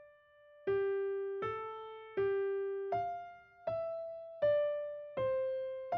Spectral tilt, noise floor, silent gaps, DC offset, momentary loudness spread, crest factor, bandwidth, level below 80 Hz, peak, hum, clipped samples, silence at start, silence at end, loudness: -4.5 dB/octave; -62 dBFS; none; under 0.1%; 11 LU; 14 dB; 5.4 kHz; -72 dBFS; -24 dBFS; none; under 0.1%; 0 s; 0 s; -37 LUFS